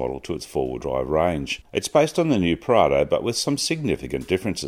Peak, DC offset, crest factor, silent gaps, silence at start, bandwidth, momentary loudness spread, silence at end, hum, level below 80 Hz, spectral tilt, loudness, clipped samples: -2 dBFS; under 0.1%; 20 dB; none; 0 s; 16 kHz; 8 LU; 0 s; none; -44 dBFS; -5 dB/octave; -22 LUFS; under 0.1%